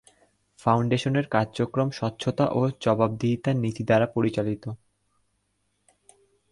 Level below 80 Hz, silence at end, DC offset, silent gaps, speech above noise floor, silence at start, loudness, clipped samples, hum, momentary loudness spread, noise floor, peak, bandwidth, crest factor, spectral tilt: -58 dBFS; 1.75 s; under 0.1%; none; 49 dB; 0.65 s; -25 LUFS; under 0.1%; 50 Hz at -60 dBFS; 7 LU; -73 dBFS; -6 dBFS; 11.5 kHz; 20 dB; -7 dB/octave